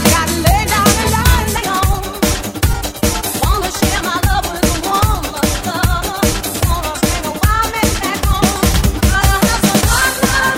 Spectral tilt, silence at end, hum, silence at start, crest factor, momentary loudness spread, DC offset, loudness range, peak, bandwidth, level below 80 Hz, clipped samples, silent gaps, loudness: -4 dB/octave; 0 s; none; 0 s; 14 dB; 5 LU; 0.2%; 2 LU; 0 dBFS; 17 kHz; -20 dBFS; under 0.1%; none; -14 LUFS